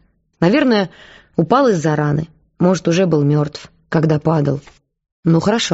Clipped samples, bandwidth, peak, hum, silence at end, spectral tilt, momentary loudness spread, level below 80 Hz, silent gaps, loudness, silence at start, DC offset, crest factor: under 0.1%; 8 kHz; 0 dBFS; none; 0 s; -6 dB/octave; 11 LU; -50 dBFS; 5.12-5.23 s; -16 LUFS; 0.4 s; under 0.1%; 16 dB